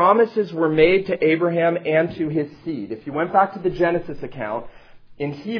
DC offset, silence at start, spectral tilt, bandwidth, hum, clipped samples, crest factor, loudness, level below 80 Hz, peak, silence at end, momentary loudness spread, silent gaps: under 0.1%; 0 s; -8.5 dB/octave; 5.4 kHz; none; under 0.1%; 18 dB; -21 LUFS; -48 dBFS; -2 dBFS; 0 s; 13 LU; none